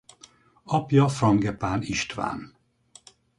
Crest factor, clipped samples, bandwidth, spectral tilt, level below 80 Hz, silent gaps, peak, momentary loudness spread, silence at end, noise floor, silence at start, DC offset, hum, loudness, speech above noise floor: 20 dB; under 0.1%; 11.5 kHz; -6 dB/octave; -52 dBFS; none; -6 dBFS; 10 LU; 0.9 s; -56 dBFS; 0.65 s; under 0.1%; none; -24 LUFS; 32 dB